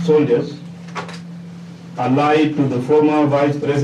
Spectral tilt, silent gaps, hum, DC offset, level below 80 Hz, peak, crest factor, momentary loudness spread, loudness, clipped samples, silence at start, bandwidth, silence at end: -7.5 dB/octave; none; none; under 0.1%; -60 dBFS; -4 dBFS; 12 dB; 19 LU; -16 LUFS; under 0.1%; 0 s; 9.8 kHz; 0 s